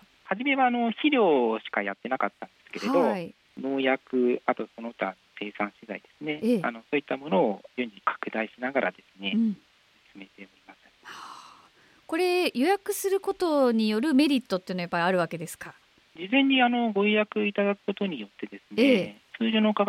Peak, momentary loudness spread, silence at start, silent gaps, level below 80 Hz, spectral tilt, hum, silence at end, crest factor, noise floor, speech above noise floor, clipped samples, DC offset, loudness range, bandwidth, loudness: -10 dBFS; 16 LU; 0.25 s; none; -74 dBFS; -5 dB/octave; none; 0 s; 16 dB; -58 dBFS; 32 dB; under 0.1%; under 0.1%; 6 LU; 16.5 kHz; -26 LUFS